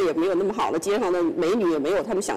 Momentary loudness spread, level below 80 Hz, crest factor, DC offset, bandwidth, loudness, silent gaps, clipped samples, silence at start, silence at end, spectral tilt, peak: 2 LU; -56 dBFS; 4 dB; under 0.1%; 15 kHz; -23 LUFS; none; under 0.1%; 0 s; 0 s; -4.5 dB/octave; -18 dBFS